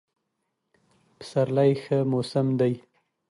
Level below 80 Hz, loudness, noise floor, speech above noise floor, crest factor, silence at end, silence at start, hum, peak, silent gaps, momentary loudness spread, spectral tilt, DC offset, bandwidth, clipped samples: -70 dBFS; -25 LUFS; -79 dBFS; 55 dB; 18 dB; 0.5 s; 1.2 s; none; -10 dBFS; none; 10 LU; -8 dB/octave; under 0.1%; 11.5 kHz; under 0.1%